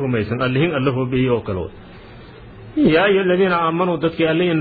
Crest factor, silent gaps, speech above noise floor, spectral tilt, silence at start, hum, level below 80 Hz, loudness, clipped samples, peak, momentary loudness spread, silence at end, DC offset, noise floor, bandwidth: 16 dB; none; 22 dB; -10.5 dB/octave; 0 s; none; -44 dBFS; -18 LUFS; under 0.1%; -2 dBFS; 9 LU; 0 s; under 0.1%; -39 dBFS; 4.9 kHz